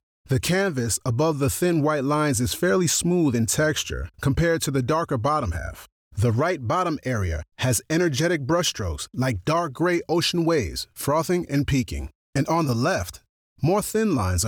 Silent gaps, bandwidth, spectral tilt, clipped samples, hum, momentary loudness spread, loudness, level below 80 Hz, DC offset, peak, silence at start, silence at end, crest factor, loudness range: 5.92-6.11 s, 12.15-12.33 s, 13.29-13.56 s; 19.5 kHz; -5 dB/octave; under 0.1%; none; 7 LU; -23 LUFS; -42 dBFS; under 0.1%; -12 dBFS; 0.3 s; 0 s; 12 dB; 3 LU